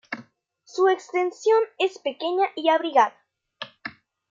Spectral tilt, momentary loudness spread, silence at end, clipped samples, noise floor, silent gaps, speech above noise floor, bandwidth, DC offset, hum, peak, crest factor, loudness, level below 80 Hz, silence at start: -3 dB/octave; 17 LU; 0.4 s; under 0.1%; -57 dBFS; none; 35 dB; 7.6 kHz; under 0.1%; none; -6 dBFS; 18 dB; -23 LUFS; -82 dBFS; 0.1 s